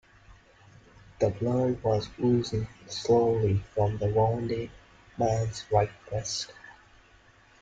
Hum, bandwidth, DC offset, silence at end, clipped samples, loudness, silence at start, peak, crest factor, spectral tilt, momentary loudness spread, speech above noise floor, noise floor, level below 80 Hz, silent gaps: none; 9 kHz; under 0.1%; 0.9 s; under 0.1%; -28 LUFS; 0.3 s; -8 dBFS; 20 dB; -6.5 dB/octave; 10 LU; 31 dB; -58 dBFS; -52 dBFS; none